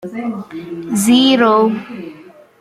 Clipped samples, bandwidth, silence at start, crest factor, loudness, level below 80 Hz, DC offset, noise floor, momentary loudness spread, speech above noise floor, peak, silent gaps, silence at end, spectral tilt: under 0.1%; 15 kHz; 0.05 s; 14 dB; -14 LUFS; -60 dBFS; under 0.1%; -40 dBFS; 20 LU; 26 dB; -2 dBFS; none; 0.4 s; -4 dB/octave